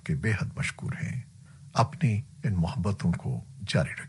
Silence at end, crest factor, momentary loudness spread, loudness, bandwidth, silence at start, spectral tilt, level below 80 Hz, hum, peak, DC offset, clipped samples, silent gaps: 0 s; 20 dB; 8 LU; -30 LUFS; 11.5 kHz; 0.05 s; -6.5 dB/octave; -50 dBFS; none; -10 dBFS; under 0.1%; under 0.1%; none